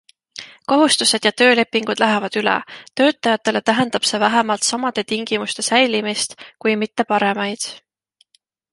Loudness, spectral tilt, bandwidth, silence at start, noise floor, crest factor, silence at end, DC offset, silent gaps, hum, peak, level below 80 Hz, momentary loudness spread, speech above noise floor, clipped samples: -17 LUFS; -2.5 dB/octave; 11.5 kHz; 0.35 s; -63 dBFS; 18 dB; 0.95 s; under 0.1%; none; none; -2 dBFS; -66 dBFS; 10 LU; 45 dB; under 0.1%